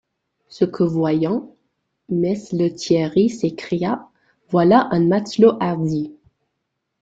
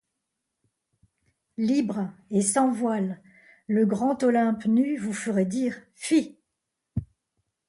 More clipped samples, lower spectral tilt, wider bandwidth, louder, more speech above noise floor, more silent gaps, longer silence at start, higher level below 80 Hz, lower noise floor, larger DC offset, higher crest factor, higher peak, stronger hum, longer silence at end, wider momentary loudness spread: neither; first, -7 dB/octave vs -5.5 dB/octave; second, 8 kHz vs 11.5 kHz; first, -19 LUFS vs -26 LUFS; about the same, 58 dB vs 58 dB; neither; second, 0.5 s vs 1.6 s; about the same, -58 dBFS vs -58 dBFS; second, -76 dBFS vs -82 dBFS; neither; about the same, 18 dB vs 16 dB; first, -2 dBFS vs -10 dBFS; neither; first, 0.9 s vs 0.65 s; second, 10 LU vs 13 LU